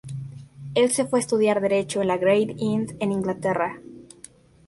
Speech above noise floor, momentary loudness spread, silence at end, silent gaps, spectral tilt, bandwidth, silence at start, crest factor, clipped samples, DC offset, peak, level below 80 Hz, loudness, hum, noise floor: 27 dB; 16 LU; 0.65 s; none; -5 dB/octave; 11.5 kHz; 0.05 s; 16 dB; under 0.1%; under 0.1%; -8 dBFS; -60 dBFS; -23 LUFS; none; -49 dBFS